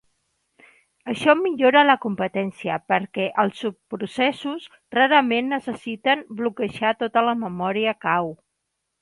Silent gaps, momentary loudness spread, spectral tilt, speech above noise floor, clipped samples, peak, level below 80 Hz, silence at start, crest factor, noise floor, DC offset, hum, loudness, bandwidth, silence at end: none; 14 LU; -5.5 dB/octave; 56 dB; under 0.1%; -2 dBFS; -66 dBFS; 1.05 s; 20 dB; -78 dBFS; under 0.1%; none; -22 LUFS; 11.5 kHz; 0.7 s